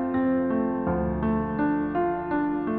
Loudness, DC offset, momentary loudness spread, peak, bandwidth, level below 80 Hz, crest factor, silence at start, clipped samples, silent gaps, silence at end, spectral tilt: -26 LUFS; under 0.1%; 2 LU; -14 dBFS; 4.3 kHz; -42 dBFS; 12 dB; 0 s; under 0.1%; none; 0 s; -12 dB/octave